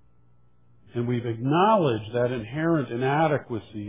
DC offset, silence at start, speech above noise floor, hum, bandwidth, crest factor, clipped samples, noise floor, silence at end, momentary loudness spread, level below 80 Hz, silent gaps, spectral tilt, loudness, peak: 0.1%; 0.95 s; 38 dB; none; 3.8 kHz; 16 dB; under 0.1%; -62 dBFS; 0 s; 9 LU; -58 dBFS; none; -11 dB/octave; -25 LUFS; -8 dBFS